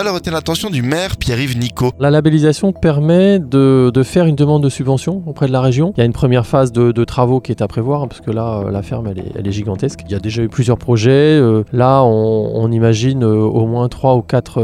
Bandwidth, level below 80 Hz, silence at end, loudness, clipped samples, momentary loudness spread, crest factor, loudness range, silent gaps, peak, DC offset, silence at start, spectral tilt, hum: 15 kHz; -38 dBFS; 0 s; -14 LUFS; under 0.1%; 10 LU; 12 dB; 6 LU; none; 0 dBFS; under 0.1%; 0 s; -7 dB/octave; none